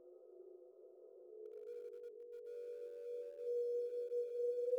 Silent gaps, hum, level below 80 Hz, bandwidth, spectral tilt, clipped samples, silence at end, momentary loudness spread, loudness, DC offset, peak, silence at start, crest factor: none; none; under -90 dBFS; 6.6 kHz; -3.5 dB/octave; under 0.1%; 0 s; 20 LU; -45 LUFS; under 0.1%; -30 dBFS; 0 s; 16 dB